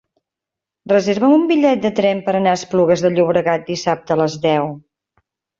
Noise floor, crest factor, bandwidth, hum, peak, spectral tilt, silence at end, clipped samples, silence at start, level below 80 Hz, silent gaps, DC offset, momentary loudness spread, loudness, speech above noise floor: -85 dBFS; 14 dB; 7.8 kHz; none; -2 dBFS; -6 dB/octave; 0.8 s; under 0.1%; 0.85 s; -58 dBFS; none; under 0.1%; 6 LU; -16 LUFS; 70 dB